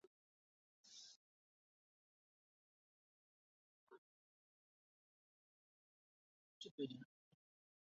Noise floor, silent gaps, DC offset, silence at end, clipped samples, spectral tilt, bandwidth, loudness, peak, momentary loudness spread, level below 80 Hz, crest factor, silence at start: under -90 dBFS; 0.07-0.84 s, 1.16-3.87 s, 3.98-6.61 s, 6.71-6.78 s; under 0.1%; 0.8 s; under 0.1%; -5 dB/octave; 7.4 kHz; -55 LUFS; -36 dBFS; 13 LU; under -90 dBFS; 26 dB; 0.05 s